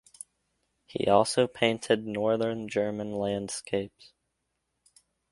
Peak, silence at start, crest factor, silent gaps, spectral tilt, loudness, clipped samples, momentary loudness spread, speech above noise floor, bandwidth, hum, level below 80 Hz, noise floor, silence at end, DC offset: -6 dBFS; 0.95 s; 24 dB; none; -4.5 dB/octave; -28 LUFS; under 0.1%; 18 LU; 52 dB; 11.5 kHz; none; -64 dBFS; -80 dBFS; 1.45 s; under 0.1%